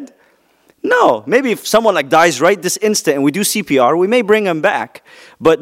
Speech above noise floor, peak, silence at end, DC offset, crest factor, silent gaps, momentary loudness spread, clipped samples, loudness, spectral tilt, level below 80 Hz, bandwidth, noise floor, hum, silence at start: 41 dB; 0 dBFS; 0 s; under 0.1%; 14 dB; none; 5 LU; under 0.1%; -13 LUFS; -3.5 dB/octave; -56 dBFS; 16.5 kHz; -54 dBFS; none; 0 s